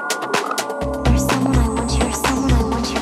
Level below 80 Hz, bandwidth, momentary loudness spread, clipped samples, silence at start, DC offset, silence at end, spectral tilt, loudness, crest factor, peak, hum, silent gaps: -24 dBFS; 15 kHz; 5 LU; under 0.1%; 0 s; under 0.1%; 0 s; -5 dB/octave; -19 LUFS; 14 dB; -4 dBFS; none; none